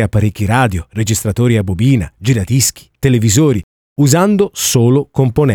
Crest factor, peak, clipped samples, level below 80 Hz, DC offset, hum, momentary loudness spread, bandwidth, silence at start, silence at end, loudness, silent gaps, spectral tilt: 12 dB; 0 dBFS; under 0.1%; -36 dBFS; under 0.1%; none; 5 LU; 19.5 kHz; 0 s; 0 s; -13 LUFS; 3.63-3.96 s; -5.5 dB/octave